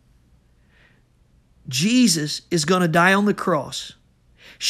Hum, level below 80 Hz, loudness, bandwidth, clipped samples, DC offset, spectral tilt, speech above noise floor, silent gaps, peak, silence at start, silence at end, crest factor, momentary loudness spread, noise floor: none; -58 dBFS; -19 LUFS; 15 kHz; under 0.1%; under 0.1%; -4 dB/octave; 39 dB; none; -2 dBFS; 1.65 s; 0 s; 20 dB; 13 LU; -58 dBFS